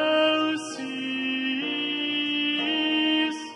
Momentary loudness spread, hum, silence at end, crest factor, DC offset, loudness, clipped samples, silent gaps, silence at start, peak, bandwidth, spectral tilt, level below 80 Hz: 8 LU; none; 0 s; 14 dB; under 0.1%; -25 LUFS; under 0.1%; none; 0 s; -12 dBFS; 11 kHz; -2.5 dB/octave; -76 dBFS